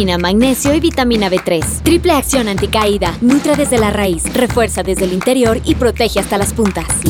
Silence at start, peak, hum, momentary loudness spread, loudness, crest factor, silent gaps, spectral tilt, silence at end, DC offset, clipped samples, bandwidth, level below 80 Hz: 0 s; 0 dBFS; none; 3 LU; -13 LUFS; 12 dB; none; -4.5 dB/octave; 0 s; under 0.1%; under 0.1%; 18.5 kHz; -26 dBFS